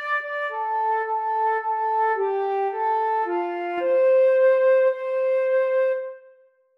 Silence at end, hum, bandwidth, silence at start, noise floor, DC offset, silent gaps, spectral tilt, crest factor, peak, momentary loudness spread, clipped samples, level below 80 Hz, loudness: 0.6 s; none; 5 kHz; 0 s; -56 dBFS; under 0.1%; none; -4 dB/octave; 12 dB; -10 dBFS; 8 LU; under 0.1%; -88 dBFS; -22 LUFS